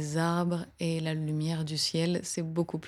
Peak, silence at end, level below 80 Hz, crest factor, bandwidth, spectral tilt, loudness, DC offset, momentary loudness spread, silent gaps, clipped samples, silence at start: -14 dBFS; 0 s; -64 dBFS; 16 dB; 13.5 kHz; -5 dB/octave; -31 LUFS; under 0.1%; 4 LU; none; under 0.1%; 0 s